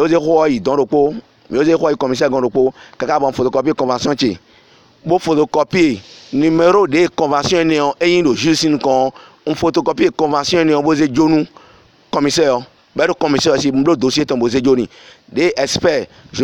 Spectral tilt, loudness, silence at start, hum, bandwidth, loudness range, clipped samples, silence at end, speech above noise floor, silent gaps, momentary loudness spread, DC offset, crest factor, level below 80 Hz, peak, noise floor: -5 dB/octave; -15 LUFS; 0 s; none; 12 kHz; 3 LU; under 0.1%; 0 s; 34 dB; none; 8 LU; under 0.1%; 14 dB; -48 dBFS; 0 dBFS; -48 dBFS